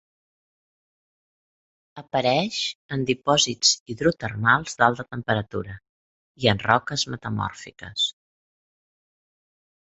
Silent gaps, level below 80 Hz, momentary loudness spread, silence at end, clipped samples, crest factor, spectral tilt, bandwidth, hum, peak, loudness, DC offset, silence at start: 2.75-2.89 s, 3.80-3.86 s, 5.89-6.35 s; -56 dBFS; 11 LU; 1.75 s; under 0.1%; 26 dB; -3 dB/octave; 8.2 kHz; none; 0 dBFS; -23 LUFS; under 0.1%; 1.95 s